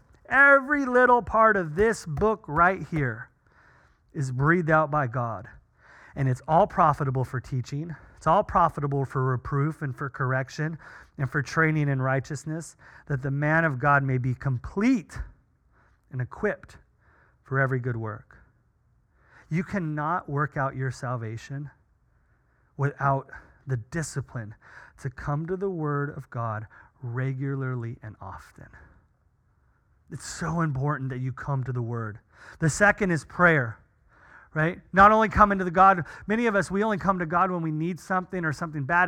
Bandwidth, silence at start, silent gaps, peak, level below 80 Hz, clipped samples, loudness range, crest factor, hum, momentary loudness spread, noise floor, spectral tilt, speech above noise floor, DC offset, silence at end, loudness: 11.5 kHz; 0.3 s; none; -4 dBFS; -50 dBFS; under 0.1%; 11 LU; 22 dB; none; 18 LU; -66 dBFS; -7 dB/octave; 41 dB; under 0.1%; 0 s; -25 LUFS